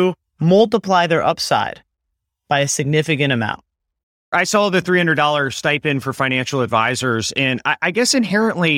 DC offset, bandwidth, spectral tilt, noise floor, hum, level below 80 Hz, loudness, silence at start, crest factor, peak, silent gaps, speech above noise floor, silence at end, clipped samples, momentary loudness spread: under 0.1%; 16.5 kHz; -4 dB/octave; -77 dBFS; none; -58 dBFS; -17 LUFS; 0 s; 16 dB; -2 dBFS; 4.03-4.32 s; 60 dB; 0 s; under 0.1%; 6 LU